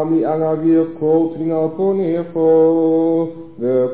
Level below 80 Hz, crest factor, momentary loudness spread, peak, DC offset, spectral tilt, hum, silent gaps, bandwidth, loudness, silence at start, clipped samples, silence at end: -58 dBFS; 10 dB; 7 LU; -4 dBFS; 0.6%; -13 dB/octave; none; none; 4 kHz; -16 LUFS; 0 s; under 0.1%; 0 s